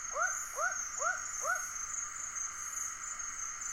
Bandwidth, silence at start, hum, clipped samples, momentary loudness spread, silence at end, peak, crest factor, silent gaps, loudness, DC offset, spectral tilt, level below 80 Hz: 16.5 kHz; 0 s; none; under 0.1%; 4 LU; 0 s; -22 dBFS; 16 dB; none; -36 LUFS; under 0.1%; 1.5 dB/octave; -64 dBFS